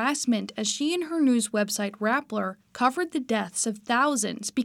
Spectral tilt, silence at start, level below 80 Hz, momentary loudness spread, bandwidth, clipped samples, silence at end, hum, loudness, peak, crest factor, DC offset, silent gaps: -3 dB/octave; 0 s; -74 dBFS; 5 LU; 16.5 kHz; under 0.1%; 0 s; none; -26 LUFS; -8 dBFS; 18 dB; under 0.1%; none